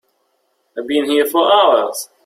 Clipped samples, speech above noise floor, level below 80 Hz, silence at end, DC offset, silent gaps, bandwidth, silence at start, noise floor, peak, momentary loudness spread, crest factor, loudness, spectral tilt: under 0.1%; 50 dB; -64 dBFS; 0.2 s; under 0.1%; none; 16.5 kHz; 0.75 s; -65 dBFS; -2 dBFS; 15 LU; 14 dB; -14 LUFS; -2 dB/octave